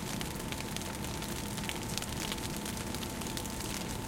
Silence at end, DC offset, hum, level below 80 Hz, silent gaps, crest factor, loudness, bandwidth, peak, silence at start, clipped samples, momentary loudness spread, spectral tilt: 0 s; under 0.1%; none; -48 dBFS; none; 26 dB; -37 LUFS; 17 kHz; -12 dBFS; 0 s; under 0.1%; 2 LU; -3.5 dB/octave